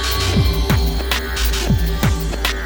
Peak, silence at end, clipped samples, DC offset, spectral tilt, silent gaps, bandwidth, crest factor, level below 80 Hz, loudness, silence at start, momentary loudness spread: -2 dBFS; 0 s; under 0.1%; under 0.1%; -4.5 dB/octave; none; over 20 kHz; 16 dB; -20 dBFS; -18 LUFS; 0 s; 3 LU